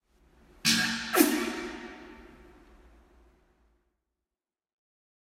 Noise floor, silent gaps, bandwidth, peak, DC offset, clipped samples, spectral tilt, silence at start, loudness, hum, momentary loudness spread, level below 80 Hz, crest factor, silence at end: under -90 dBFS; none; 16 kHz; -6 dBFS; under 0.1%; under 0.1%; -2 dB/octave; 0.65 s; -27 LUFS; none; 22 LU; -60 dBFS; 28 dB; 3.05 s